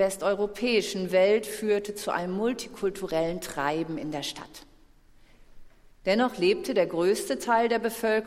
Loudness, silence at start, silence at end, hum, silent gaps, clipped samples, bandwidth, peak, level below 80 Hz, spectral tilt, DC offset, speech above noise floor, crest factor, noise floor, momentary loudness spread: -27 LUFS; 0 s; 0 s; none; none; under 0.1%; 16 kHz; -10 dBFS; -56 dBFS; -4.5 dB/octave; under 0.1%; 29 dB; 18 dB; -56 dBFS; 9 LU